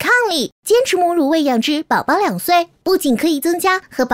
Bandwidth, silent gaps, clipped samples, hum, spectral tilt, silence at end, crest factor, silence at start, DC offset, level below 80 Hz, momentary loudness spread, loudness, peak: 16 kHz; 0.52-0.63 s; under 0.1%; none; -3.5 dB/octave; 0 s; 12 dB; 0 s; under 0.1%; -56 dBFS; 4 LU; -16 LUFS; -4 dBFS